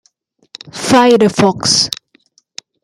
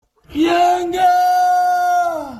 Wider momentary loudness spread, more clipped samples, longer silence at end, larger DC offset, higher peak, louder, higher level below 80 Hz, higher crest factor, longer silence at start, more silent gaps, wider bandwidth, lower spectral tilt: first, 25 LU vs 4 LU; neither; first, 0.9 s vs 0 s; neither; first, 0 dBFS vs -4 dBFS; first, -11 LUFS vs -15 LUFS; about the same, -52 dBFS vs -50 dBFS; about the same, 14 dB vs 10 dB; first, 0.65 s vs 0.3 s; neither; first, 16 kHz vs 13.5 kHz; about the same, -3.5 dB/octave vs -3.5 dB/octave